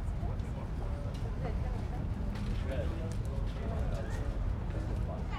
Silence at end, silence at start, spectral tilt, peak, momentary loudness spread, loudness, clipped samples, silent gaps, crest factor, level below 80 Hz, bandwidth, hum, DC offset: 0 s; 0 s; -7.5 dB/octave; -22 dBFS; 2 LU; -37 LUFS; under 0.1%; none; 12 dB; -36 dBFS; 11.5 kHz; none; under 0.1%